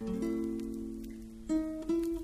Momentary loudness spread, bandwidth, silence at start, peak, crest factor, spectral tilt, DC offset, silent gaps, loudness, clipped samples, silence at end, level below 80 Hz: 11 LU; 15 kHz; 0 s; -22 dBFS; 14 dB; -7 dB/octave; under 0.1%; none; -36 LUFS; under 0.1%; 0 s; -52 dBFS